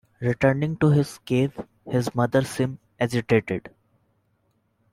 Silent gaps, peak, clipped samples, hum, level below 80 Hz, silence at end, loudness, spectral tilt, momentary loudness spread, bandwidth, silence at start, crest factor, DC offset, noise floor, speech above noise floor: none; -6 dBFS; under 0.1%; none; -56 dBFS; 1.25 s; -24 LUFS; -7 dB/octave; 8 LU; 15 kHz; 0.2 s; 18 dB; under 0.1%; -69 dBFS; 46 dB